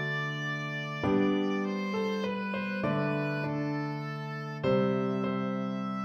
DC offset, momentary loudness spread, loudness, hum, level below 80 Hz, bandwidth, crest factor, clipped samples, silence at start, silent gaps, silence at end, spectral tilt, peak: under 0.1%; 7 LU; -31 LUFS; none; -64 dBFS; 6.8 kHz; 16 dB; under 0.1%; 0 s; none; 0 s; -7.5 dB/octave; -16 dBFS